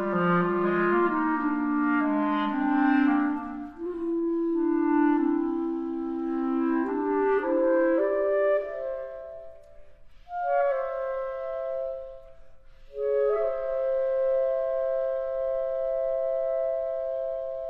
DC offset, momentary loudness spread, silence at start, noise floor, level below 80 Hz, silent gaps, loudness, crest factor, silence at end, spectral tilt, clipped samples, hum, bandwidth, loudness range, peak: under 0.1%; 10 LU; 0 s; -47 dBFS; -56 dBFS; none; -27 LUFS; 14 dB; 0 s; -9.5 dB/octave; under 0.1%; none; 5.2 kHz; 6 LU; -12 dBFS